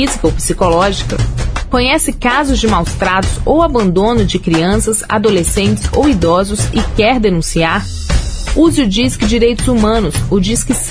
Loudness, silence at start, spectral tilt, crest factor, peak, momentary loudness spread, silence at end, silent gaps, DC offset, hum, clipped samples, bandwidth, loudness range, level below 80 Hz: -13 LUFS; 0 s; -4.5 dB/octave; 12 dB; 0 dBFS; 5 LU; 0 s; none; under 0.1%; none; under 0.1%; 11 kHz; 1 LU; -20 dBFS